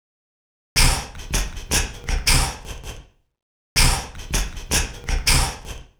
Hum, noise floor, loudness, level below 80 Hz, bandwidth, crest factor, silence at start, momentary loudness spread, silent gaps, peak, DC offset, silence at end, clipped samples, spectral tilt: none; -40 dBFS; -21 LUFS; -26 dBFS; over 20 kHz; 20 dB; 0.75 s; 12 LU; 3.42-3.76 s; -4 dBFS; under 0.1%; 0.15 s; under 0.1%; -2 dB/octave